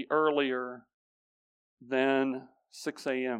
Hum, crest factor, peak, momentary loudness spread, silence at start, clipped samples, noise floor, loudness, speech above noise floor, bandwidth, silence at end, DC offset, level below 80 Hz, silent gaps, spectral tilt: none; 18 dB; -14 dBFS; 14 LU; 0 s; under 0.1%; under -90 dBFS; -30 LUFS; over 60 dB; 14.5 kHz; 0 s; under 0.1%; -88 dBFS; 0.94-1.77 s; -4.5 dB/octave